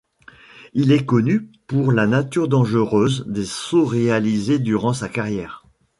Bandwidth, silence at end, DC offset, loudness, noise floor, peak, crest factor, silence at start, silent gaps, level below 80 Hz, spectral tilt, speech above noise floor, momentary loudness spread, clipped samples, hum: 11.5 kHz; 0.4 s; under 0.1%; -19 LUFS; -47 dBFS; -4 dBFS; 16 dB; 0.55 s; none; -52 dBFS; -6.5 dB/octave; 29 dB; 8 LU; under 0.1%; none